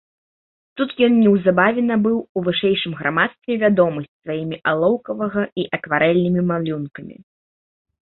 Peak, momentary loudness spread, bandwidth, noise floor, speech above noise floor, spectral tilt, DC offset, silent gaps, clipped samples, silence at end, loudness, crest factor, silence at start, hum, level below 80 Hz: -2 dBFS; 12 LU; 4.2 kHz; under -90 dBFS; over 71 dB; -11.5 dB/octave; under 0.1%; 2.29-2.35 s, 4.08-4.20 s, 5.52-5.56 s; under 0.1%; 0.9 s; -19 LUFS; 18 dB; 0.75 s; none; -58 dBFS